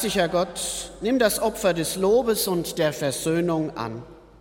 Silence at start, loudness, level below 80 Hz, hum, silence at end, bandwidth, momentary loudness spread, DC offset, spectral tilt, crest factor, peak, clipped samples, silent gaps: 0 s; -24 LUFS; -50 dBFS; none; 0.2 s; 17 kHz; 8 LU; under 0.1%; -4 dB/octave; 16 dB; -6 dBFS; under 0.1%; none